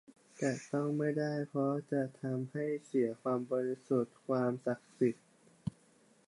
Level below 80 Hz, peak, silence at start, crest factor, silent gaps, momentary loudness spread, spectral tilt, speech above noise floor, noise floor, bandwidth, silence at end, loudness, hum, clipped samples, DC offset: -76 dBFS; -18 dBFS; 0.4 s; 16 dB; none; 5 LU; -7.5 dB/octave; 32 dB; -67 dBFS; 11.5 kHz; 0.6 s; -36 LUFS; none; under 0.1%; under 0.1%